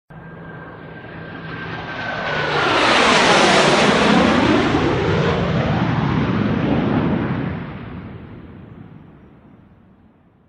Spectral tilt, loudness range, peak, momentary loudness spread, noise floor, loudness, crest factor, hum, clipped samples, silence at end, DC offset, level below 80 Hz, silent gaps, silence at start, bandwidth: -5 dB/octave; 10 LU; -2 dBFS; 23 LU; -52 dBFS; -16 LUFS; 18 dB; none; under 0.1%; 1.6 s; under 0.1%; -40 dBFS; none; 0.1 s; 11.5 kHz